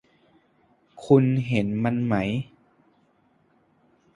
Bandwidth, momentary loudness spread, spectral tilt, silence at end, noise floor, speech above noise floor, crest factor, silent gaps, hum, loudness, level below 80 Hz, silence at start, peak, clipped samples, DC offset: 10.5 kHz; 16 LU; -8.5 dB/octave; 1.7 s; -64 dBFS; 42 dB; 22 dB; none; none; -23 LUFS; -58 dBFS; 0.95 s; -4 dBFS; under 0.1%; under 0.1%